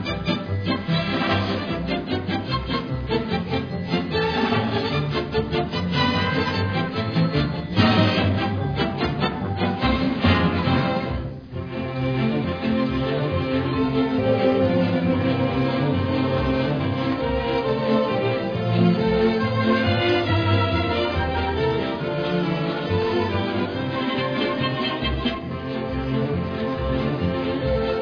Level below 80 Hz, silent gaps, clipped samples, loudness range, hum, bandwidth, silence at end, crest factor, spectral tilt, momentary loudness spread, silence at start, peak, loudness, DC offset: -38 dBFS; none; under 0.1%; 4 LU; none; 5.4 kHz; 0 s; 18 dB; -8 dB/octave; 6 LU; 0 s; -4 dBFS; -23 LUFS; under 0.1%